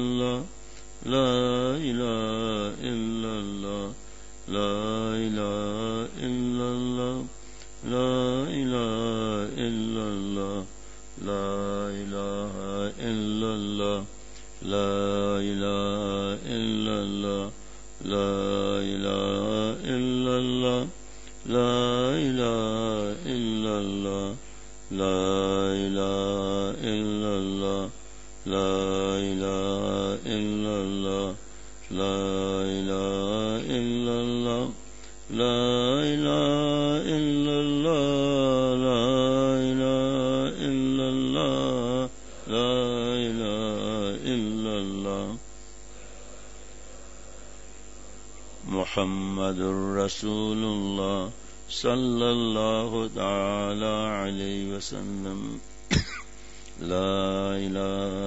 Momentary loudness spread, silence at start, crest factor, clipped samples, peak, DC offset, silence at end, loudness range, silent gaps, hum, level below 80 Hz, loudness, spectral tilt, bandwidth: 19 LU; 0 s; 18 dB; under 0.1%; -8 dBFS; 0.8%; 0 s; 7 LU; none; none; -48 dBFS; -27 LUFS; -5.5 dB/octave; 8 kHz